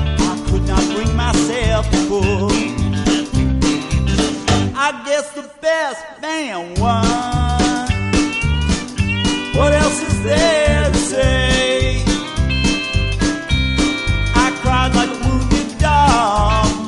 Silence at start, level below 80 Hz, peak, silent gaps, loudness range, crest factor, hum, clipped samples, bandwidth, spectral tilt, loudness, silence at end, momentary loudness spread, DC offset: 0 s; -22 dBFS; -2 dBFS; none; 3 LU; 14 dB; none; under 0.1%; 11.5 kHz; -5 dB/octave; -16 LUFS; 0 s; 5 LU; under 0.1%